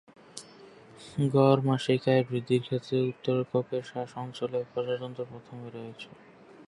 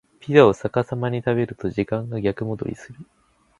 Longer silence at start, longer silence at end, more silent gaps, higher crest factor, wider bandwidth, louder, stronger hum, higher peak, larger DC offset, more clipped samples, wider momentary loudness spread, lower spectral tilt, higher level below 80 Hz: about the same, 0.35 s vs 0.25 s; second, 0.05 s vs 0.55 s; neither; about the same, 22 dB vs 22 dB; about the same, 11.5 kHz vs 10.5 kHz; second, -29 LUFS vs -22 LUFS; neither; second, -8 dBFS vs 0 dBFS; neither; neither; first, 22 LU vs 13 LU; about the same, -7 dB/octave vs -7.5 dB/octave; second, -70 dBFS vs -52 dBFS